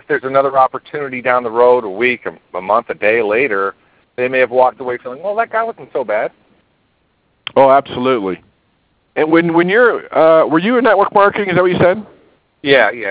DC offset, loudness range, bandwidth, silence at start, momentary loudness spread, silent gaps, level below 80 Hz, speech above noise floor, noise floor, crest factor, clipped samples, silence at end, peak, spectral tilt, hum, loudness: under 0.1%; 6 LU; 4 kHz; 0.1 s; 13 LU; none; -54 dBFS; 47 dB; -60 dBFS; 14 dB; under 0.1%; 0 s; 0 dBFS; -9 dB/octave; none; -14 LUFS